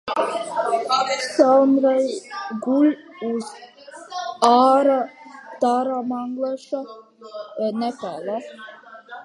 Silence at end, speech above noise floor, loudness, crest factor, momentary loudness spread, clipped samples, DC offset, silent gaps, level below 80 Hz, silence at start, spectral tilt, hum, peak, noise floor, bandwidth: 0 s; 20 dB; -21 LUFS; 20 dB; 23 LU; under 0.1%; under 0.1%; none; -76 dBFS; 0.05 s; -4 dB/octave; none; -2 dBFS; -40 dBFS; 11.5 kHz